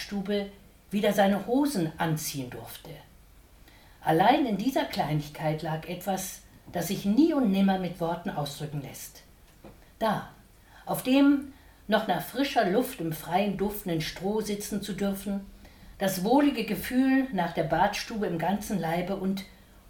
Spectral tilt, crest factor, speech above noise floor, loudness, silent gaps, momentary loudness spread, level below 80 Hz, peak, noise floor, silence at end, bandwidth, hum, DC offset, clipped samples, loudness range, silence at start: -5.5 dB/octave; 18 dB; 27 dB; -28 LUFS; none; 14 LU; -54 dBFS; -10 dBFS; -54 dBFS; 0.4 s; 19 kHz; none; under 0.1%; under 0.1%; 3 LU; 0 s